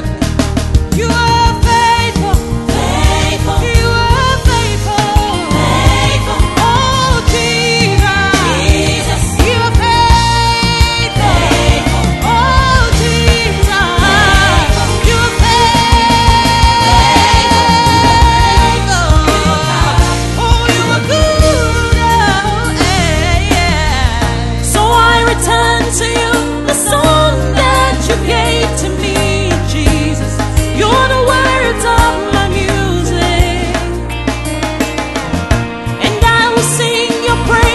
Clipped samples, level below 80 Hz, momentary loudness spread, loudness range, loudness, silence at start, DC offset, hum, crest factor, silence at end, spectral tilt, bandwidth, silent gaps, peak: 0.4%; -16 dBFS; 6 LU; 4 LU; -11 LUFS; 0 s; 0.5%; none; 10 dB; 0 s; -4 dB/octave; 12.5 kHz; none; 0 dBFS